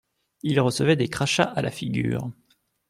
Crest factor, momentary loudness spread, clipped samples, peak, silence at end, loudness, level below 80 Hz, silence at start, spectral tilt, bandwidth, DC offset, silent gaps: 20 dB; 9 LU; under 0.1%; -6 dBFS; 0.6 s; -24 LUFS; -56 dBFS; 0.45 s; -5 dB/octave; 15 kHz; under 0.1%; none